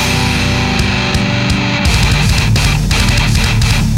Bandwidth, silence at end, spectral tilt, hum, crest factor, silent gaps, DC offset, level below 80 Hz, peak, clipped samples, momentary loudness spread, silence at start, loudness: 16.5 kHz; 0 s; -4.5 dB/octave; none; 10 dB; none; under 0.1%; -18 dBFS; 0 dBFS; under 0.1%; 2 LU; 0 s; -12 LUFS